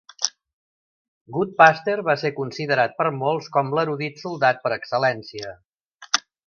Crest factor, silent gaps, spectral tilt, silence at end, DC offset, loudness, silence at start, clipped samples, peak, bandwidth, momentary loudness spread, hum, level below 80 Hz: 22 dB; 0.53-1.25 s, 5.65-5.73 s, 5.81-5.99 s; -3.5 dB/octave; 0.25 s; under 0.1%; -22 LUFS; 0.2 s; under 0.1%; 0 dBFS; 7 kHz; 14 LU; none; -66 dBFS